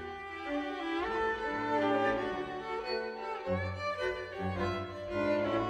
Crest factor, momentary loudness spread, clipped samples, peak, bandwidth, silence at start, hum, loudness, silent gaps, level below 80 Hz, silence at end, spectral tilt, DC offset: 16 dB; 8 LU; under 0.1%; -18 dBFS; 10.5 kHz; 0 s; none; -34 LUFS; none; -58 dBFS; 0 s; -6.5 dB/octave; under 0.1%